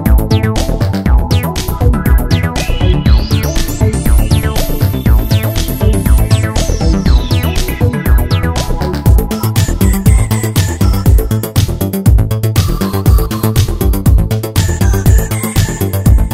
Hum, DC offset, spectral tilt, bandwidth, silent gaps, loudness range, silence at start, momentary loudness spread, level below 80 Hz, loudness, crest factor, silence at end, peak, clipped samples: none; under 0.1%; -6 dB/octave; 16.5 kHz; none; 1 LU; 0 s; 4 LU; -14 dBFS; -12 LUFS; 10 dB; 0 s; 0 dBFS; 0.8%